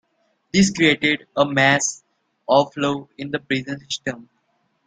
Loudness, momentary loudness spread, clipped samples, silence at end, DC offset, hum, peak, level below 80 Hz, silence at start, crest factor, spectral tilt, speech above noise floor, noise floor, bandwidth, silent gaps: -20 LUFS; 13 LU; under 0.1%; 0.65 s; under 0.1%; none; -2 dBFS; -58 dBFS; 0.55 s; 20 dB; -4 dB/octave; 48 dB; -68 dBFS; 9.6 kHz; none